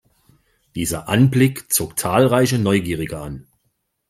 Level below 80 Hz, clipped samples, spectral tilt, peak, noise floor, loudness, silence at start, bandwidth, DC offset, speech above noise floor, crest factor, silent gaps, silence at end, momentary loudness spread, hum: -48 dBFS; under 0.1%; -5 dB/octave; -2 dBFS; -70 dBFS; -18 LUFS; 0.75 s; 16 kHz; under 0.1%; 52 dB; 18 dB; none; 0.7 s; 16 LU; none